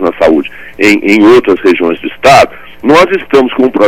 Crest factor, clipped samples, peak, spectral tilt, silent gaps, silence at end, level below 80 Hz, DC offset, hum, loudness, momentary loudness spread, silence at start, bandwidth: 8 dB; 5%; 0 dBFS; -5 dB/octave; none; 0 s; -38 dBFS; under 0.1%; none; -7 LUFS; 8 LU; 0 s; 16.5 kHz